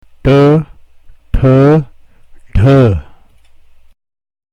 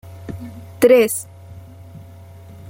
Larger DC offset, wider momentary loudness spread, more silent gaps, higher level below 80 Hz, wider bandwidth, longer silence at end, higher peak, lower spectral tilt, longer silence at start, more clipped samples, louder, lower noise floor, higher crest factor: neither; second, 14 LU vs 26 LU; neither; first, -24 dBFS vs -52 dBFS; second, 7 kHz vs 17 kHz; first, 1.5 s vs 0.65 s; about the same, 0 dBFS vs -2 dBFS; first, -9.5 dB/octave vs -4.5 dB/octave; first, 0.25 s vs 0.05 s; neither; first, -10 LUFS vs -15 LUFS; about the same, -41 dBFS vs -40 dBFS; second, 12 dB vs 18 dB